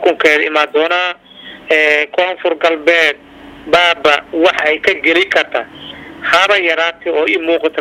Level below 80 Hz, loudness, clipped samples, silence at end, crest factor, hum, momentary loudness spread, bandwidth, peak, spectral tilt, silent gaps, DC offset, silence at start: -52 dBFS; -12 LUFS; under 0.1%; 0 s; 14 dB; none; 16 LU; 15 kHz; 0 dBFS; -2.5 dB/octave; none; under 0.1%; 0 s